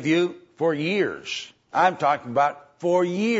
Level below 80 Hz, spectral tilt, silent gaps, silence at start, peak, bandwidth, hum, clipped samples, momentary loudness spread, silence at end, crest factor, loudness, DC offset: -72 dBFS; -5.5 dB/octave; none; 0 s; -6 dBFS; 8 kHz; none; under 0.1%; 9 LU; 0 s; 16 dB; -24 LUFS; under 0.1%